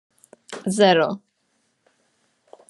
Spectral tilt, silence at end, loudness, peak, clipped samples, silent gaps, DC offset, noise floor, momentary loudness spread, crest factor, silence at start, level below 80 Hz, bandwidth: -4.5 dB/octave; 1.55 s; -19 LUFS; -2 dBFS; under 0.1%; none; under 0.1%; -69 dBFS; 20 LU; 22 dB; 0.5 s; -74 dBFS; 12 kHz